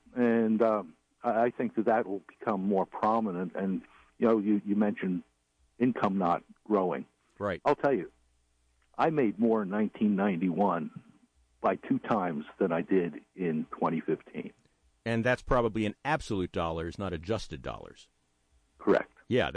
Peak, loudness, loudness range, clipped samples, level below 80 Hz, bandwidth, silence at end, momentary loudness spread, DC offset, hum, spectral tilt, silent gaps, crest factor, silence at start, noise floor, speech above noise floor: -14 dBFS; -30 LUFS; 3 LU; under 0.1%; -54 dBFS; 10 kHz; 0 s; 10 LU; under 0.1%; none; -7.5 dB/octave; none; 16 dB; 0.15 s; -71 dBFS; 42 dB